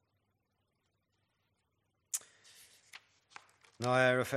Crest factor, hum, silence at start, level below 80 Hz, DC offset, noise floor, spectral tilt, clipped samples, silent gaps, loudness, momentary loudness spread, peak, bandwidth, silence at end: 24 dB; none; 2.15 s; -82 dBFS; under 0.1%; -81 dBFS; -4 dB/octave; under 0.1%; none; -33 LUFS; 27 LU; -14 dBFS; 15 kHz; 0 s